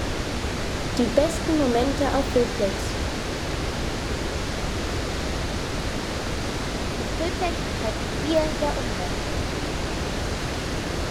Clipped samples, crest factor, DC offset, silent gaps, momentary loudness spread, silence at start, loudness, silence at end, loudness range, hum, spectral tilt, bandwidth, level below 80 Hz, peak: under 0.1%; 20 dB; under 0.1%; none; 6 LU; 0 s; -26 LUFS; 0 s; 4 LU; none; -4.5 dB/octave; 17.5 kHz; -32 dBFS; -6 dBFS